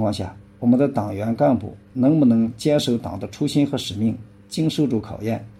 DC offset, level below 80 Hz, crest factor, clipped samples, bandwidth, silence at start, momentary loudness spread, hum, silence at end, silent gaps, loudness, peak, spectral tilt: under 0.1%; -54 dBFS; 14 dB; under 0.1%; 13 kHz; 0 s; 12 LU; none; 0.05 s; none; -21 LUFS; -6 dBFS; -7 dB/octave